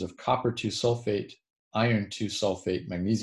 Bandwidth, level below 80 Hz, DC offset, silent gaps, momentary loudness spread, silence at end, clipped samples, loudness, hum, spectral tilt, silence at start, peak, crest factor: 12 kHz; -54 dBFS; under 0.1%; 1.50-1.71 s; 6 LU; 0 s; under 0.1%; -29 LUFS; none; -5.5 dB/octave; 0 s; -12 dBFS; 18 dB